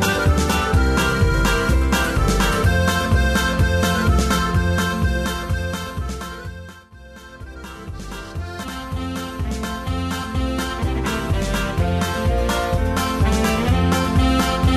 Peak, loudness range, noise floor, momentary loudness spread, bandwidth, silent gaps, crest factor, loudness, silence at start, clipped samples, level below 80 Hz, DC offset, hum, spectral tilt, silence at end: -6 dBFS; 12 LU; -41 dBFS; 14 LU; 14 kHz; none; 14 dB; -20 LUFS; 0 s; under 0.1%; -24 dBFS; under 0.1%; none; -5 dB/octave; 0 s